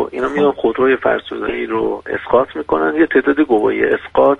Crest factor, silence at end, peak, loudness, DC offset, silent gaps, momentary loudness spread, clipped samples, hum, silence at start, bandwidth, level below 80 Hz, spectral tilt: 14 dB; 0 s; 0 dBFS; -16 LUFS; under 0.1%; none; 6 LU; under 0.1%; none; 0 s; 6.8 kHz; -46 dBFS; -7 dB/octave